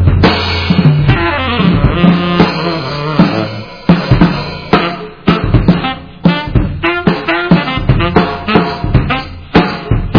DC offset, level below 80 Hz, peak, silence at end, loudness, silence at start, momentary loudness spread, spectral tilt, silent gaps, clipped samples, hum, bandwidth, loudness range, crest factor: 0.6%; -22 dBFS; 0 dBFS; 0 s; -12 LUFS; 0 s; 7 LU; -8 dB/octave; none; 1%; none; 5.4 kHz; 2 LU; 10 dB